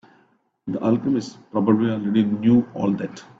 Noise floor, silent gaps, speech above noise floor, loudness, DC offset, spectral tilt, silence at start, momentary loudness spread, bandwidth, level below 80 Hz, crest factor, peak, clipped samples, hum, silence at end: -62 dBFS; none; 41 dB; -21 LUFS; under 0.1%; -8 dB/octave; 0.65 s; 10 LU; 7.8 kHz; -60 dBFS; 16 dB; -4 dBFS; under 0.1%; none; 0.15 s